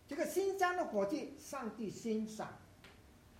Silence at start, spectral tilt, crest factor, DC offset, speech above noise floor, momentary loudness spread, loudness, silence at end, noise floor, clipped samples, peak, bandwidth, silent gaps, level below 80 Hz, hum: 0.1 s; -4.5 dB/octave; 18 dB; under 0.1%; 21 dB; 13 LU; -39 LUFS; 0 s; -61 dBFS; under 0.1%; -22 dBFS; 16 kHz; none; -70 dBFS; none